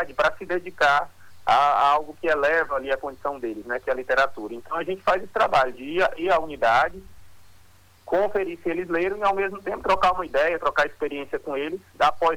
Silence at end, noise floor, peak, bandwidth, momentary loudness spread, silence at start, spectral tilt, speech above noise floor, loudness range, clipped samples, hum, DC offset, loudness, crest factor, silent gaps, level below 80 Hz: 0 s; -55 dBFS; -8 dBFS; 19 kHz; 9 LU; 0 s; -4.5 dB/octave; 31 dB; 3 LU; under 0.1%; none; under 0.1%; -23 LUFS; 16 dB; none; -52 dBFS